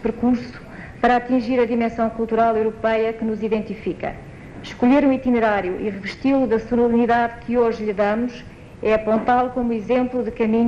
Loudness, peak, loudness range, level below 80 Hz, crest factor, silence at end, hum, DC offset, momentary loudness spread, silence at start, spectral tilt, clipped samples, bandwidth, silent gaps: -20 LUFS; -4 dBFS; 2 LU; -44 dBFS; 14 dB; 0 s; none; under 0.1%; 11 LU; 0 s; -7.5 dB/octave; under 0.1%; 7.4 kHz; none